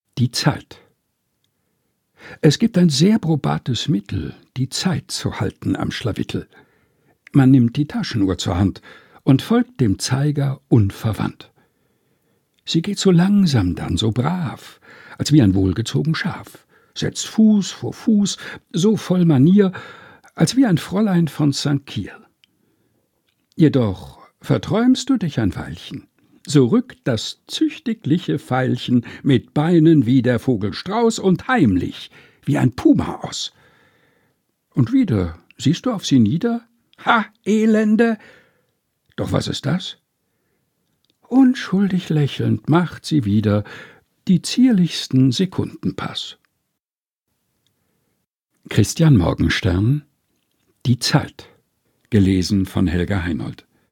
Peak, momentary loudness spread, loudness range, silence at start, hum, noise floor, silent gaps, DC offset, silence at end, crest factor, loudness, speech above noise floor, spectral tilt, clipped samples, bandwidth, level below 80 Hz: 0 dBFS; 13 LU; 5 LU; 0.15 s; none; under -90 dBFS; 46.98-47.02 s, 48.27-48.31 s; under 0.1%; 0.35 s; 18 dB; -18 LUFS; over 72 dB; -6 dB/octave; under 0.1%; 16.5 kHz; -46 dBFS